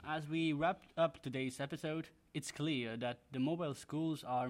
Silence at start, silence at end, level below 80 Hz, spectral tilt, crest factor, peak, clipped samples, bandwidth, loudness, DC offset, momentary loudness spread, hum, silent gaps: 0 s; 0 s; -74 dBFS; -5.5 dB/octave; 16 dB; -22 dBFS; under 0.1%; 15.5 kHz; -40 LUFS; under 0.1%; 6 LU; none; none